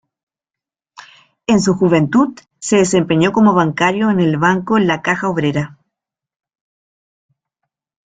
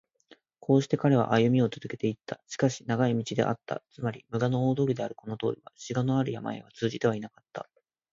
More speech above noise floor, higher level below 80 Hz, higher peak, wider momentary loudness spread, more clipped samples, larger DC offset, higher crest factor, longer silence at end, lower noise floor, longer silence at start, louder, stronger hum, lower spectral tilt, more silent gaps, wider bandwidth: first, 74 dB vs 33 dB; first, -52 dBFS vs -66 dBFS; first, 0 dBFS vs -8 dBFS; second, 7 LU vs 15 LU; neither; neither; about the same, 16 dB vs 20 dB; first, 2.4 s vs 0.5 s; first, -88 dBFS vs -61 dBFS; first, 1.5 s vs 0.7 s; first, -14 LUFS vs -29 LUFS; neither; second, -5.5 dB/octave vs -7 dB/octave; neither; first, 9.4 kHz vs 7.6 kHz